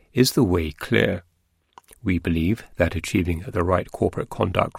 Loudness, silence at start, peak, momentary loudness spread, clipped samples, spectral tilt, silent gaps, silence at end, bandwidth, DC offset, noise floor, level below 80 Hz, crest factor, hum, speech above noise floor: -23 LUFS; 0.15 s; -2 dBFS; 6 LU; under 0.1%; -6 dB/octave; none; 0 s; 16.5 kHz; under 0.1%; -55 dBFS; -40 dBFS; 20 dB; none; 33 dB